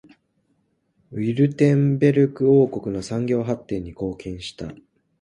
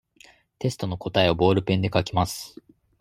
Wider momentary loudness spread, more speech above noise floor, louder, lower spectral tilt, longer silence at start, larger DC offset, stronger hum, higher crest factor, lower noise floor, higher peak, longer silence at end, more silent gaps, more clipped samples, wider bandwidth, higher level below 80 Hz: first, 16 LU vs 11 LU; first, 48 dB vs 32 dB; first, -21 LUFS vs -24 LUFS; first, -8 dB/octave vs -5.5 dB/octave; first, 1.1 s vs 0.6 s; neither; neither; about the same, 18 dB vs 20 dB; first, -68 dBFS vs -55 dBFS; about the same, -4 dBFS vs -4 dBFS; about the same, 0.45 s vs 0.5 s; neither; neither; second, 11 kHz vs 16 kHz; about the same, -52 dBFS vs -52 dBFS